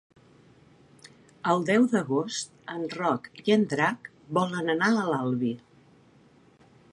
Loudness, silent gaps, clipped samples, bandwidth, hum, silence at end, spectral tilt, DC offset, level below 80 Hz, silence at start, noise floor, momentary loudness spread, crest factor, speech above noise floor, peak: -27 LUFS; none; under 0.1%; 11.5 kHz; none; 1.35 s; -5.5 dB/octave; under 0.1%; -72 dBFS; 1.45 s; -58 dBFS; 11 LU; 20 dB; 32 dB; -8 dBFS